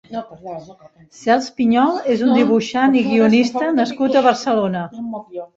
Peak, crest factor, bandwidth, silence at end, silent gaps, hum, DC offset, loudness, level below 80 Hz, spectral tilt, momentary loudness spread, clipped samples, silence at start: -2 dBFS; 16 dB; 7.8 kHz; 0.1 s; none; none; under 0.1%; -16 LUFS; -60 dBFS; -5.5 dB/octave; 16 LU; under 0.1%; 0.1 s